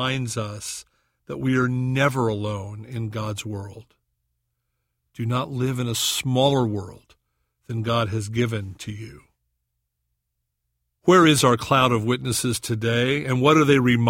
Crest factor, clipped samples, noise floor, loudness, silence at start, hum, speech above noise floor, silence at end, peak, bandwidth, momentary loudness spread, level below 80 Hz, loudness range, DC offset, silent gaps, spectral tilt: 20 dB; under 0.1%; -78 dBFS; -22 LUFS; 0 s; none; 56 dB; 0 s; -2 dBFS; 16.5 kHz; 17 LU; -54 dBFS; 10 LU; under 0.1%; none; -5 dB/octave